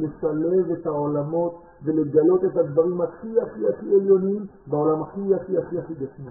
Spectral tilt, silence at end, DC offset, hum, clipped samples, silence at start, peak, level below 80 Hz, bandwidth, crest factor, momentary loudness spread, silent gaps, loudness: -3 dB/octave; 0 s; under 0.1%; none; under 0.1%; 0 s; -6 dBFS; -58 dBFS; 1.8 kHz; 16 dB; 11 LU; none; -23 LUFS